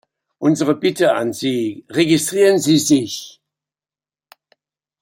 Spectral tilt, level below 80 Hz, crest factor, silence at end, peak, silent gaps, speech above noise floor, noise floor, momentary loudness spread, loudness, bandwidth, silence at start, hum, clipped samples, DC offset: -4.5 dB/octave; -62 dBFS; 16 dB; 1.7 s; -2 dBFS; none; over 74 dB; under -90 dBFS; 8 LU; -17 LUFS; 16.5 kHz; 0.4 s; none; under 0.1%; under 0.1%